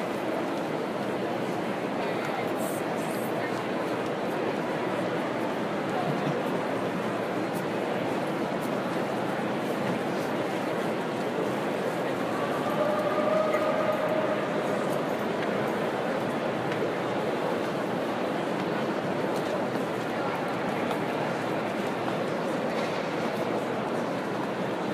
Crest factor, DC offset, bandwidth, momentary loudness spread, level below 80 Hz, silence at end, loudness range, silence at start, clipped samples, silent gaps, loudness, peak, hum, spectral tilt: 16 dB; under 0.1%; 15.5 kHz; 3 LU; -68 dBFS; 0 s; 2 LU; 0 s; under 0.1%; none; -29 LUFS; -14 dBFS; none; -5.5 dB/octave